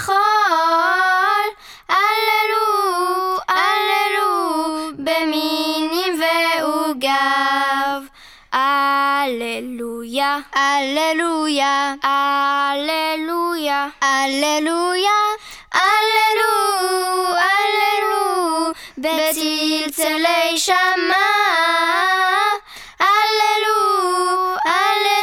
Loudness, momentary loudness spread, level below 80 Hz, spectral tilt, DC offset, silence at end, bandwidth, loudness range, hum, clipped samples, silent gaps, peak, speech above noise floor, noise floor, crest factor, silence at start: -17 LUFS; 6 LU; -58 dBFS; -0.5 dB/octave; under 0.1%; 0 s; 18 kHz; 3 LU; none; under 0.1%; none; -4 dBFS; 25 dB; -42 dBFS; 14 dB; 0 s